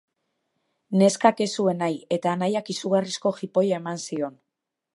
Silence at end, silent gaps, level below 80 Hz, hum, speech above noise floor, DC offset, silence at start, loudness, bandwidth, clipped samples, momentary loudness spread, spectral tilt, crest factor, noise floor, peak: 0.65 s; none; -76 dBFS; none; 60 dB; under 0.1%; 0.9 s; -24 LUFS; 11.5 kHz; under 0.1%; 10 LU; -5.5 dB/octave; 22 dB; -84 dBFS; -4 dBFS